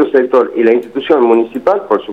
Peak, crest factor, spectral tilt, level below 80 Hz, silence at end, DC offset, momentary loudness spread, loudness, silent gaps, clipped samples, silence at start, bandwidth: 0 dBFS; 12 dB; -6.5 dB/octave; -56 dBFS; 0 s; 0.2%; 5 LU; -12 LUFS; none; under 0.1%; 0 s; 5.2 kHz